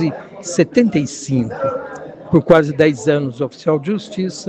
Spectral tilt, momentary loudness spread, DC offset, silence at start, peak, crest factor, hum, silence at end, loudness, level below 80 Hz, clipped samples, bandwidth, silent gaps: -6 dB/octave; 12 LU; under 0.1%; 0 s; 0 dBFS; 16 dB; none; 0 s; -17 LUFS; -50 dBFS; under 0.1%; 9.2 kHz; none